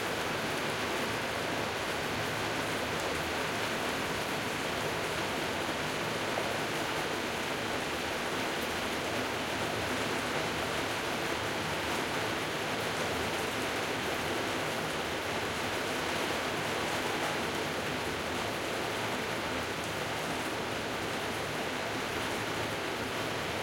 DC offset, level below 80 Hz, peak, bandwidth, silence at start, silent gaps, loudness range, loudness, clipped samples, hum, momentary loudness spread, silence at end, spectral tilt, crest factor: under 0.1%; -58 dBFS; -18 dBFS; 16.5 kHz; 0 s; none; 1 LU; -33 LUFS; under 0.1%; none; 2 LU; 0 s; -3 dB/octave; 16 dB